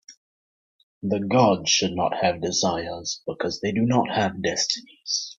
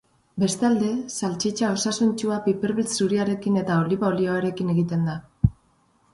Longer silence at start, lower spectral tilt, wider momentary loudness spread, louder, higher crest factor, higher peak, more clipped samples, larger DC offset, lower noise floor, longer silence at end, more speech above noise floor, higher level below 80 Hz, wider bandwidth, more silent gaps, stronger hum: second, 0.1 s vs 0.35 s; second, -3.5 dB/octave vs -5.5 dB/octave; first, 10 LU vs 4 LU; about the same, -23 LUFS vs -24 LUFS; about the same, 22 dB vs 20 dB; about the same, -4 dBFS vs -4 dBFS; neither; neither; first, under -90 dBFS vs -63 dBFS; second, 0.05 s vs 0.6 s; first, over 66 dB vs 40 dB; second, -60 dBFS vs -46 dBFS; second, 7.8 kHz vs 11.5 kHz; first, 0.17-1.01 s vs none; neither